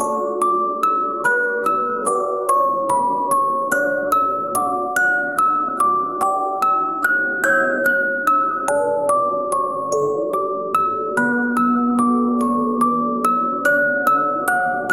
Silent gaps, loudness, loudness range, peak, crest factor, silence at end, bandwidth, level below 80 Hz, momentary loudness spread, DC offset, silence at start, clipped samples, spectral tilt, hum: none; -18 LUFS; 1 LU; -2 dBFS; 16 dB; 0 s; 17 kHz; -64 dBFS; 3 LU; 0.2%; 0 s; under 0.1%; -4.5 dB/octave; none